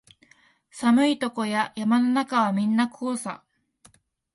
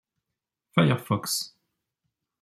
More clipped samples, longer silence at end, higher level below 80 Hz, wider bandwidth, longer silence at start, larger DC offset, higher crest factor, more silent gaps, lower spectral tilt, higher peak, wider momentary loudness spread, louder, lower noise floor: neither; about the same, 1 s vs 0.95 s; about the same, -70 dBFS vs -66 dBFS; second, 11.5 kHz vs 15 kHz; about the same, 0.75 s vs 0.75 s; neither; second, 18 dB vs 24 dB; neither; about the same, -5 dB/octave vs -5 dB/octave; about the same, -8 dBFS vs -6 dBFS; first, 10 LU vs 7 LU; about the same, -24 LUFS vs -26 LUFS; second, -59 dBFS vs -86 dBFS